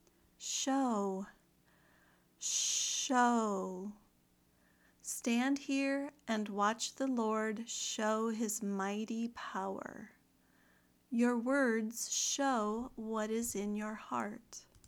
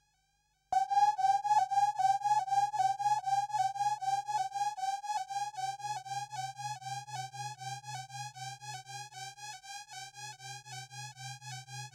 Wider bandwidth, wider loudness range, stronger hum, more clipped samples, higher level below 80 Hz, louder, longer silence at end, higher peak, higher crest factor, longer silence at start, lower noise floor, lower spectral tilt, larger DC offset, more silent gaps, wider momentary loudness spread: first, 19 kHz vs 15 kHz; second, 3 LU vs 14 LU; first, 60 Hz at -75 dBFS vs none; neither; first, -74 dBFS vs -80 dBFS; about the same, -36 LUFS vs -34 LUFS; first, 0.25 s vs 0.05 s; about the same, -18 dBFS vs -18 dBFS; about the same, 18 dB vs 18 dB; second, 0.4 s vs 0.7 s; second, -71 dBFS vs -76 dBFS; first, -3 dB/octave vs -1.5 dB/octave; neither; neither; second, 11 LU vs 16 LU